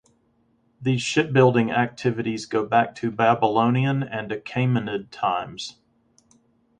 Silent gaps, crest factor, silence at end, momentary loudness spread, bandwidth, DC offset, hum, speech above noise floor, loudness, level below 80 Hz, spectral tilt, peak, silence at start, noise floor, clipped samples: none; 20 dB; 1.1 s; 11 LU; 9.6 kHz; under 0.1%; none; 43 dB; -22 LUFS; -62 dBFS; -6 dB/octave; -4 dBFS; 0.8 s; -65 dBFS; under 0.1%